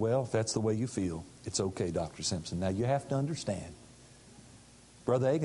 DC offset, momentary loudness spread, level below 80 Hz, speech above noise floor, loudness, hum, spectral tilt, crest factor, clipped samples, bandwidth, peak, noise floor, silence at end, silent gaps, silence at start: under 0.1%; 10 LU; -54 dBFS; 25 dB; -33 LUFS; none; -5.5 dB/octave; 18 dB; under 0.1%; 11.5 kHz; -16 dBFS; -57 dBFS; 0 s; none; 0 s